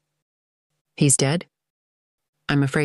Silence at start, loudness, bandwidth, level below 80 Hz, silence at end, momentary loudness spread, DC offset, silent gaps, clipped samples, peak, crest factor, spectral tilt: 1 s; -21 LUFS; 12.5 kHz; -58 dBFS; 0 s; 11 LU; under 0.1%; 1.70-2.18 s, 2.28-2.33 s; under 0.1%; -6 dBFS; 20 dB; -4.5 dB/octave